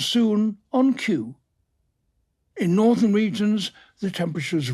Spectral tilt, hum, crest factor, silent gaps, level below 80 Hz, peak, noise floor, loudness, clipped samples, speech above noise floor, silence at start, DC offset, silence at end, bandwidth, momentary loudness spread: -6 dB/octave; none; 14 dB; none; -68 dBFS; -8 dBFS; -71 dBFS; -22 LUFS; under 0.1%; 50 dB; 0 s; under 0.1%; 0 s; 13 kHz; 11 LU